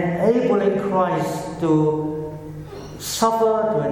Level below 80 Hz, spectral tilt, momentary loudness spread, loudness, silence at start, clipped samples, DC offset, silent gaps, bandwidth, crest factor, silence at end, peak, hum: -50 dBFS; -6 dB/octave; 15 LU; -20 LUFS; 0 s; under 0.1%; under 0.1%; none; 17.5 kHz; 16 dB; 0 s; -4 dBFS; none